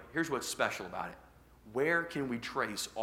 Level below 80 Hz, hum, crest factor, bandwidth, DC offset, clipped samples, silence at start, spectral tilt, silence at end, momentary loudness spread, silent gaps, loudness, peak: -64 dBFS; none; 22 dB; 16.5 kHz; under 0.1%; under 0.1%; 0 s; -3.5 dB/octave; 0 s; 10 LU; none; -35 LUFS; -14 dBFS